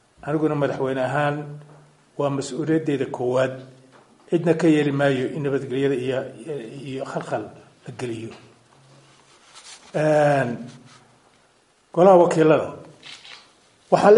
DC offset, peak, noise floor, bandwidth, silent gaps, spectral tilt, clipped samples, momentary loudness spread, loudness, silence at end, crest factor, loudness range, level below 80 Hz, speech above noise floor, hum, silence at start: under 0.1%; 0 dBFS; -60 dBFS; 11.5 kHz; none; -6.5 dB/octave; under 0.1%; 22 LU; -22 LUFS; 0 s; 22 dB; 11 LU; -66 dBFS; 39 dB; none; 0.25 s